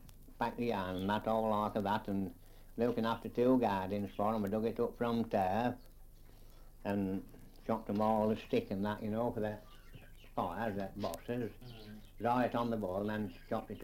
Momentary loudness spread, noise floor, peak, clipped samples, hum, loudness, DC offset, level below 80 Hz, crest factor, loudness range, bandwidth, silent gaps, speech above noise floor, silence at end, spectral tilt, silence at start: 12 LU; -55 dBFS; -20 dBFS; under 0.1%; none; -36 LUFS; under 0.1%; -56 dBFS; 18 dB; 4 LU; 16.5 kHz; none; 20 dB; 0 s; -7.5 dB/octave; 0 s